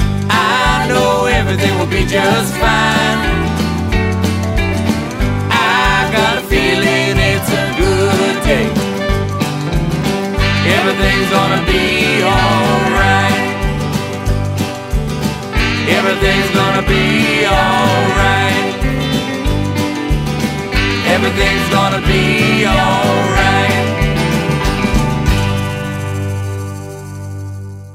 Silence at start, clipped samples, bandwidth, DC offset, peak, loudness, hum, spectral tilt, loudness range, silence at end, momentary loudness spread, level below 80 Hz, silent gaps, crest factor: 0 s; under 0.1%; 16 kHz; under 0.1%; 0 dBFS; -13 LUFS; 50 Hz at -40 dBFS; -5 dB/octave; 3 LU; 0 s; 7 LU; -24 dBFS; none; 14 dB